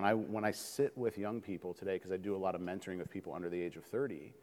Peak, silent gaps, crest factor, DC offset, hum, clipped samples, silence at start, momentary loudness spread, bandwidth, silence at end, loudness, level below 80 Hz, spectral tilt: -16 dBFS; none; 22 dB; under 0.1%; none; under 0.1%; 0 s; 8 LU; 17.5 kHz; 0 s; -39 LUFS; -76 dBFS; -5.5 dB/octave